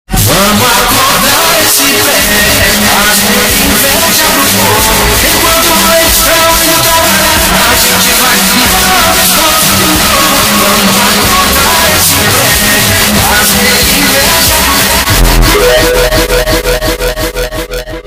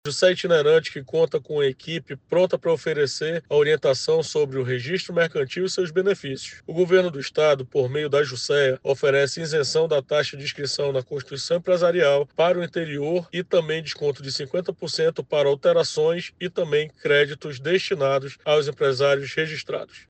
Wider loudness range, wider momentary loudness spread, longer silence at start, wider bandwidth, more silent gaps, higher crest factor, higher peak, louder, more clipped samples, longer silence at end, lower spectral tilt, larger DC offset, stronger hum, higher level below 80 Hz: about the same, 1 LU vs 2 LU; second, 3 LU vs 8 LU; about the same, 0.1 s vs 0.05 s; first, over 20 kHz vs 9 kHz; neither; second, 6 dB vs 16 dB; first, 0 dBFS vs -6 dBFS; first, -5 LUFS vs -23 LUFS; first, 1% vs under 0.1%; about the same, 0 s vs 0.1 s; second, -2 dB/octave vs -4.5 dB/octave; neither; neither; first, -20 dBFS vs -66 dBFS